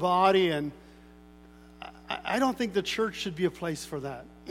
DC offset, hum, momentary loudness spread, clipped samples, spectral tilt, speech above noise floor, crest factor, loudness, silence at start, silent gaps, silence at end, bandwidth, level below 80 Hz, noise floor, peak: under 0.1%; 60 Hz at -55 dBFS; 19 LU; under 0.1%; -5 dB/octave; 24 dB; 20 dB; -29 LUFS; 0 s; none; 0 s; 16 kHz; -58 dBFS; -52 dBFS; -10 dBFS